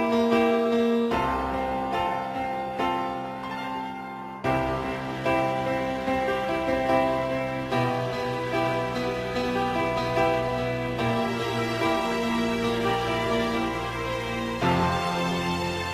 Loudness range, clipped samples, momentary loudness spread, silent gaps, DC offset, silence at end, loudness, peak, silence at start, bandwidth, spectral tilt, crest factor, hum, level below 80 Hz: 3 LU; under 0.1%; 6 LU; none; under 0.1%; 0 s; -26 LUFS; -10 dBFS; 0 s; 15.5 kHz; -5.5 dB/octave; 16 dB; none; -46 dBFS